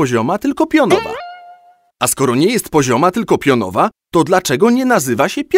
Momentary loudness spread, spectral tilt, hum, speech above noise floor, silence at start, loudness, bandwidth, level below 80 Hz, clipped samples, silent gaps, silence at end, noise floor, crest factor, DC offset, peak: 5 LU; -4.5 dB/octave; none; 32 dB; 0 s; -14 LUFS; 16.5 kHz; -50 dBFS; under 0.1%; none; 0 s; -46 dBFS; 14 dB; under 0.1%; 0 dBFS